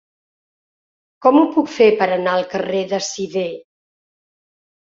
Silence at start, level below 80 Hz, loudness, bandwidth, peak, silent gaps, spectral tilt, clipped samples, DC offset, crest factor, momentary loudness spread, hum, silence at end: 1.2 s; -64 dBFS; -17 LUFS; 7.8 kHz; -2 dBFS; none; -4.5 dB/octave; under 0.1%; under 0.1%; 18 dB; 10 LU; none; 1.25 s